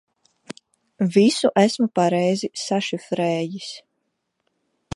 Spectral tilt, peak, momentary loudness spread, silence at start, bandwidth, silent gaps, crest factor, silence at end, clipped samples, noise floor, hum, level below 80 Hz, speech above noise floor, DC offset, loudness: -5.5 dB/octave; -2 dBFS; 23 LU; 1 s; 11.5 kHz; none; 20 dB; 1.15 s; under 0.1%; -75 dBFS; none; -70 dBFS; 55 dB; under 0.1%; -21 LUFS